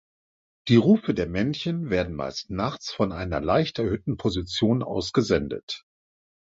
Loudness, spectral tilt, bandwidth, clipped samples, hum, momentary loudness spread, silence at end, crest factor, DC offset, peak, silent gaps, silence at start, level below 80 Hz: -25 LUFS; -6.5 dB/octave; 7.8 kHz; under 0.1%; none; 11 LU; 0.7 s; 20 dB; under 0.1%; -6 dBFS; 5.63-5.68 s; 0.65 s; -46 dBFS